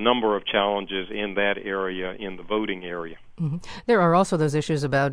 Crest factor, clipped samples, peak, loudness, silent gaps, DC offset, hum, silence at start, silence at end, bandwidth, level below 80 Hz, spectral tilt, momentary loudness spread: 20 dB; under 0.1%; -4 dBFS; -24 LUFS; none; under 0.1%; none; 0 s; 0 s; 11 kHz; -52 dBFS; -5.5 dB/octave; 12 LU